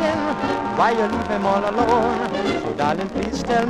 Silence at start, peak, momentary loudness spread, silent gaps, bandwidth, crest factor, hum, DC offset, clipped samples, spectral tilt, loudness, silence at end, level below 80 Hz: 0 s; -4 dBFS; 5 LU; none; 12.5 kHz; 16 dB; none; under 0.1%; under 0.1%; -5.5 dB/octave; -21 LUFS; 0 s; -42 dBFS